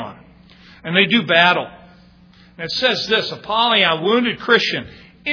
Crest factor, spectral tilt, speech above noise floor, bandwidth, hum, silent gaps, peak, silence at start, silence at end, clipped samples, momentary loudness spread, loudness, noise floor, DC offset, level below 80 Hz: 18 dB; -4.5 dB/octave; 31 dB; 5.4 kHz; none; none; 0 dBFS; 0 s; 0 s; under 0.1%; 16 LU; -16 LUFS; -48 dBFS; under 0.1%; -56 dBFS